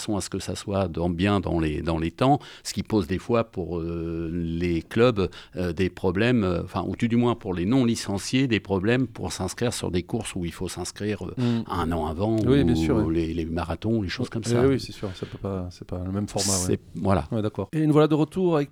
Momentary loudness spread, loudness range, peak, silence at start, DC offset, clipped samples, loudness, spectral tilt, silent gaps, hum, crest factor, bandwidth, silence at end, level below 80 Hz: 9 LU; 3 LU; -6 dBFS; 0 s; under 0.1%; under 0.1%; -25 LUFS; -6 dB/octave; none; none; 18 dB; 17 kHz; 0.05 s; -44 dBFS